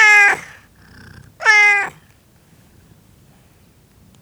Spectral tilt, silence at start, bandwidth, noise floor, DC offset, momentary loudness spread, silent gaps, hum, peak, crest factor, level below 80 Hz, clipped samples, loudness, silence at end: 0 dB/octave; 0 s; over 20 kHz; -51 dBFS; under 0.1%; 14 LU; none; none; 0 dBFS; 18 dB; -56 dBFS; under 0.1%; -12 LUFS; 2.3 s